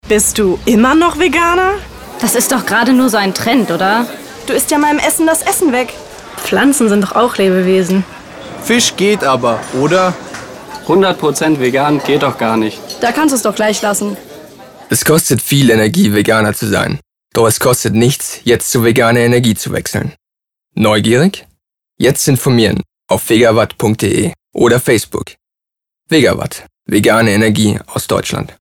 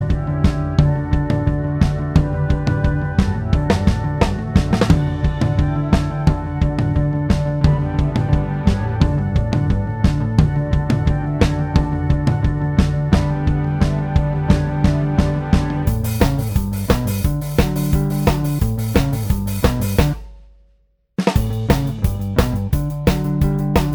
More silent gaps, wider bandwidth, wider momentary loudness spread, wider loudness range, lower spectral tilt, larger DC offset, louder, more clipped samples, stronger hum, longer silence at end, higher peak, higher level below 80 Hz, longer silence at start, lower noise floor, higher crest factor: neither; about the same, 19 kHz vs over 20 kHz; first, 12 LU vs 3 LU; about the same, 2 LU vs 2 LU; second, -4.5 dB/octave vs -7.5 dB/octave; neither; first, -12 LUFS vs -18 LUFS; neither; neither; about the same, 0.1 s vs 0 s; about the same, 0 dBFS vs 0 dBFS; second, -42 dBFS vs -24 dBFS; about the same, 0.05 s vs 0 s; first, -82 dBFS vs -58 dBFS; about the same, 12 dB vs 16 dB